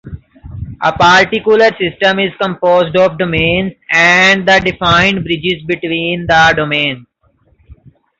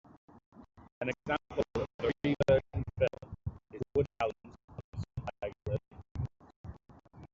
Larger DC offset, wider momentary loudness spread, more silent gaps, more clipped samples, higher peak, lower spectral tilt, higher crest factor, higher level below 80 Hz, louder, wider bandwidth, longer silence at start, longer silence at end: neither; second, 9 LU vs 21 LU; second, none vs 0.46-0.52 s, 0.92-1.01 s, 1.94-1.99 s, 4.64-4.68 s, 4.84-4.92 s, 6.11-6.15 s, 6.56-6.64 s; neither; first, 0 dBFS vs -16 dBFS; second, -4.5 dB/octave vs -6 dB/octave; second, 12 dB vs 20 dB; first, -38 dBFS vs -54 dBFS; first, -11 LUFS vs -35 LUFS; about the same, 7.8 kHz vs 7.6 kHz; second, 0.05 s vs 0.35 s; first, 0.45 s vs 0.1 s